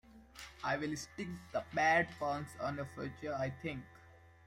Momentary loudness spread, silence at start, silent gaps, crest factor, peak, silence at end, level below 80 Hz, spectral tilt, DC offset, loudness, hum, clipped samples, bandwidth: 19 LU; 0.1 s; none; 20 dB; -18 dBFS; 0.15 s; -66 dBFS; -5 dB/octave; under 0.1%; -37 LUFS; none; under 0.1%; 16 kHz